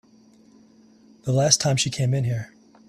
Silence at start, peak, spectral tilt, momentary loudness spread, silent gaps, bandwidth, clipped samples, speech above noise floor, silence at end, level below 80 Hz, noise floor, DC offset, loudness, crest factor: 1.25 s; 0 dBFS; -4 dB/octave; 15 LU; none; 13 kHz; under 0.1%; 33 dB; 0.4 s; -56 dBFS; -54 dBFS; under 0.1%; -22 LUFS; 24 dB